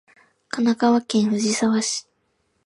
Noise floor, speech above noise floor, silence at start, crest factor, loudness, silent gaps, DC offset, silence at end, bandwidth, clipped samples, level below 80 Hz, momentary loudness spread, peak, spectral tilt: -69 dBFS; 49 dB; 0.55 s; 16 dB; -21 LUFS; none; under 0.1%; 0.65 s; 11.5 kHz; under 0.1%; -68 dBFS; 8 LU; -8 dBFS; -4 dB/octave